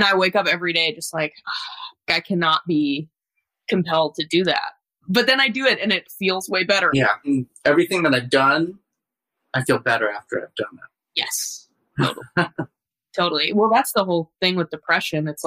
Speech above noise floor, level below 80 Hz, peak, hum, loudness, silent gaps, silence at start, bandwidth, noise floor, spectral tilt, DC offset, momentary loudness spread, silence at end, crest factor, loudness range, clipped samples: 62 dB; -62 dBFS; -4 dBFS; none; -20 LUFS; none; 0 s; 15.5 kHz; -83 dBFS; -4 dB/octave; under 0.1%; 12 LU; 0 s; 18 dB; 6 LU; under 0.1%